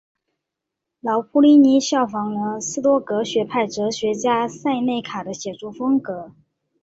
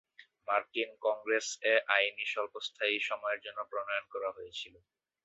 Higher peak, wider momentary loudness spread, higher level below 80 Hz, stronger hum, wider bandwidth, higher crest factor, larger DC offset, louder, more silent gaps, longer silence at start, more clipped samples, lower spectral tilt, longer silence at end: first, -4 dBFS vs -12 dBFS; first, 16 LU vs 12 LU; first, -64 dBFS vs -82 dBFS; neither; about the same, 8 kHz vs 8 kHz; second, 16 dB vs 24 dB; neither; first, -20 LUFS vs -33 LUFS; neither; first, 1.05 s vs 0.2 s; neither; first, -4.5 dB/octave vs 2.5 dB/octave; about the same, 0.55 s vs 0.55 s